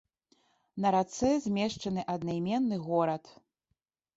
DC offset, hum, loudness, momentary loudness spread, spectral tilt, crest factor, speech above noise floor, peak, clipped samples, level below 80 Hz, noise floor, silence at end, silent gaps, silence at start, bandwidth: under 0.1%; none; -31 LUFS; 6 LU; -6 dB/octave; 18 dB; 52 dB; -16 dBFS; under 0.1%; -62 dBFS; -82 dBFS; 0.85 s; none; 0.75 s; 8 kHz